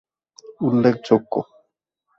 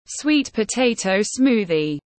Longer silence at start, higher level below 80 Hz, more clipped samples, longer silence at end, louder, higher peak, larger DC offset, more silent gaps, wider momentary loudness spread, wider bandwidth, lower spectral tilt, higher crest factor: first, 0.5 s vs 0.1 s; second, -62 dBFS vs -56 dBFS; neither; first, 0.75 s vs 0.2 s; about the same, -20 LUFS vs -20 LUFS; first, -2 dBFS vs -6 dBFS; neither; neither; first, 10 LU vs 4 LU; second, 7.2 kHz vs 8.8 kHz; first, -8 dB/octave vs -4 dB/octave; first, 20 dB vs 14 dB